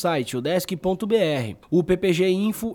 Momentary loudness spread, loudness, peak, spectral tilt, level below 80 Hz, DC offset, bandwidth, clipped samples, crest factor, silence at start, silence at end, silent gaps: 5 LU; -23 LUFS; -8 dBFS; -6 dB/octave; -52 dBFS; under 0.1%; 18.5 kHz; under 0.1%; 14 dB; 0 s; 0 s; none